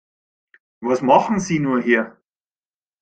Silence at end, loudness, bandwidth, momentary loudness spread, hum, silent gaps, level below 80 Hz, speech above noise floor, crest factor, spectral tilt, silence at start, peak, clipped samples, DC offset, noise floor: 0.9 s; -18 LUFS; 9 kHz; 11 LU; none; none; -58 dBFS; over 72 dB; 20 dB; -6 dB/octave; 0.8 s; -2 dBFS; under 0.1%; under 0.1%; under -90 dBFS